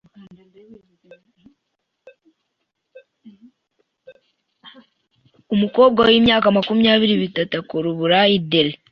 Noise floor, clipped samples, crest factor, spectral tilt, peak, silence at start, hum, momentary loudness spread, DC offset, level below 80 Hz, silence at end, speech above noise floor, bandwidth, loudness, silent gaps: -76 dBFS; under 0.1%; 18 dB; -7.5 dB/octave; -2 dBFS; 0.7 s; none; 10 LU; under 0.1%; -56 dBFS; 0.15 s; 59 dB; 5.8 kHz; -16 LUFS; none